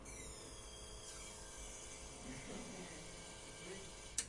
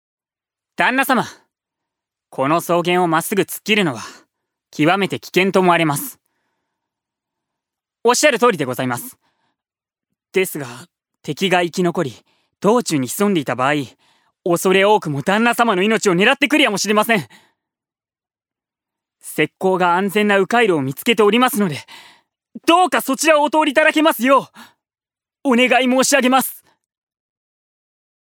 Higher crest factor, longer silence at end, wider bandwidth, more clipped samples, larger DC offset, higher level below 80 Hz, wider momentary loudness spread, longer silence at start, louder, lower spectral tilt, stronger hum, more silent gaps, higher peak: first, 28 dB vs 18 dB; second, 0 s vs 1.75 s; second, 11.5 kHz vs over 20 kHz; neither; neither; first, -60 dBFS vs -70 dBFS; second, 3 LU vs 11 LU; second, 0 s vs 0.8 s; second, -51 LUFS vs -16 LUFS; second, -2.5 dB/octave vs -4 dB/octave; neither; neither; second, -24 dBFS vs 0 dBFS